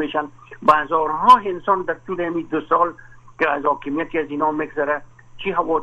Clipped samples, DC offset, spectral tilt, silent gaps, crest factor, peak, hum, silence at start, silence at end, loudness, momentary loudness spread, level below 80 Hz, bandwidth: under 0.1%; under 0.1%; -6 dB/octave; none; 18 dB; -2 dBFS; none; 0 s; 0 s; -20 LUFS; 11 LU; -52 dBFS; 10.5 kHz